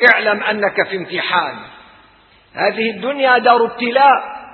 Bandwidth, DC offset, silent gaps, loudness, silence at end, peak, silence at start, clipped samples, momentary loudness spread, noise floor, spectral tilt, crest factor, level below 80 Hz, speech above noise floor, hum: 5.4 kHz; under 0.1%; none; -15 LUFS; 0 s; 0 dBFS; 0 s; under 0.1%; 9 LU; -49 dBFS; -6 dB/octave; 16 dB; -62 dBFS; 35 dB; none